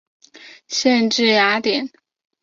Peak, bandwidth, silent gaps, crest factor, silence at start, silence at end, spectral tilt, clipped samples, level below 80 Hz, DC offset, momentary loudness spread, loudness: -2 dBFS; 7.6 kHz; none; 16 dB; 0.45 s; 0.55 s; -2.5 dB/octave; under 0.1%; -66 dBFS; under 0.1%; 10 LU; -17 LUFS